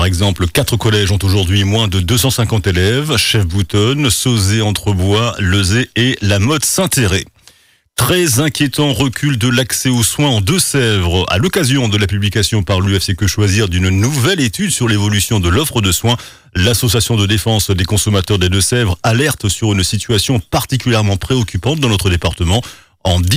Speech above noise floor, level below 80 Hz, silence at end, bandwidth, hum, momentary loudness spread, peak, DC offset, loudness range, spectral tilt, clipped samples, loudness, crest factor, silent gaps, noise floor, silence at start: 35 dB; -34 dBFS; 0 s; 16 kHz; none; 3 LU; -4 dBFS; under 0.1%; 1 LU; -4.5 dB/octave; under 0.1%; -13 LUFS; 10 dB; none; -48 dBFS; 0 s